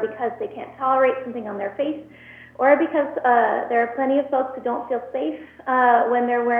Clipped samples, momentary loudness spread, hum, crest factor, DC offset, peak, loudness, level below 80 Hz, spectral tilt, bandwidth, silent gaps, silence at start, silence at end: under 0.1%; 12 LU; none; 18 dB; under 0.1%; -4 dBFS; -21 LUFS; -64 dBFS; -7.5 dB/octave; 3.8 kHz; none; 0 s; 0 s